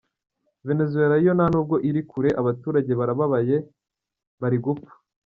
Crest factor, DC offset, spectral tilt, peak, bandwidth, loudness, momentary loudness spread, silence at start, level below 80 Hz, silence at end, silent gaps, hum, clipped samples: 16 dB; under 0.1%; -9 dB/octave; -6 dBFS; 6.6 kHz; -23 LUFS; 9 LU; 0.65 s; -56 dBFS; 0.45 s; 4.27-4.38 s; none; under 0.1%